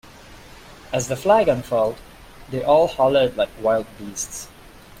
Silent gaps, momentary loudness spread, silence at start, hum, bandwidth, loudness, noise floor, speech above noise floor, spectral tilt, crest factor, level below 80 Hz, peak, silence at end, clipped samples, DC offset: none; 15 LU; 0.3 s; none; 16.5 kHz; -20 LUFS; -43 dBFS; 23 dB; -4.5 dB/octave; 18 dB; -48 dBFS; -4 dBFS; 0.55 s; under 0.1%; under 0.1%